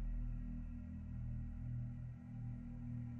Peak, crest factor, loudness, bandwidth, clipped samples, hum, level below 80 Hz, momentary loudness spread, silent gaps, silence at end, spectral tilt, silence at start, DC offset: -34 dBFS; 10 dB; -48 LUFS; 3 kHz; under 0.1%; none; -48 dBFS; 4 LU; none; 0 s; -10.5 dB/octave; 0 s; under 0.1%